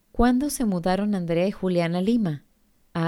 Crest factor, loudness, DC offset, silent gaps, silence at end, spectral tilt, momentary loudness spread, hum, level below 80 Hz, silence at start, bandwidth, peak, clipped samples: 16 dB; -24 LUFS; under 0.1%; none; 0 s; -6.5 dB/octave; 6 LU; none; -40 dBFS; 0.15 s; 17 kHz; -8 dBFS; under 0.1%